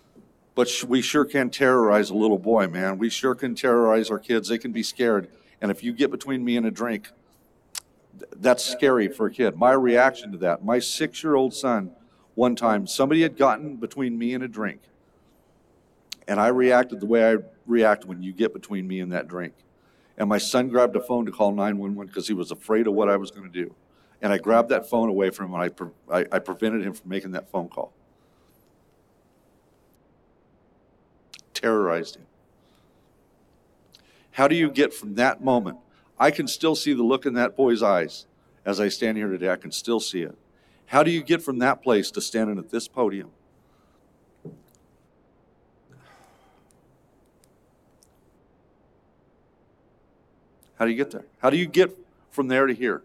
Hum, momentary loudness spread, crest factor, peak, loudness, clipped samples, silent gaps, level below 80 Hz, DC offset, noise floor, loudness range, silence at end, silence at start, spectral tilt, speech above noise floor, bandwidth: none; 13 LU; 20 dB; -4 dBFS; -23 LUFS; under 0.1%; none; -68 dBFS; under 0.1%; -61 dBFS; 9 LU; 0.05 s; 0.55 s; -4.5 dB/octave; 39 dB; 15.5 kHz